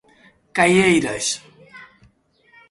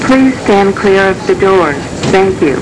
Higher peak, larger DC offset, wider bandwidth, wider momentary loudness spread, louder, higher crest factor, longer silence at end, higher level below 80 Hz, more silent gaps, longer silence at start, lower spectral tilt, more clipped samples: about the same, -2 dBFS vs -2 dBFS; neither; about the same, 11.5 kHz vs 11 kHz; first, 13 LU vs 3 LU; second, -18 LUFS vs -10 LUFS; first, 20 dB vs 8 dB; first, 0.85 s vs 0 s; second, -54 dBFS vs -34 dBFS; neither; first, 0.55 s vs 0 s; second, -4 dB/octave vs -5.5 dB/octave; neither